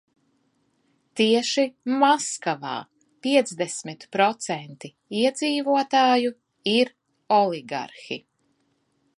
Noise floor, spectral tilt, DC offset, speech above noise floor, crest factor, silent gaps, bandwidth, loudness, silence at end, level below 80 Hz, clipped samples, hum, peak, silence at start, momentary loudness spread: -70 dBFS; -3.5 dB/octave; under 0.1%; 47 dB; 20 dB; none; 11.5 kHz; -23 LUFS; 1 s; -80 dBFS; under 0.1%; none; -6 dBFS; 1.15 s; 14 LU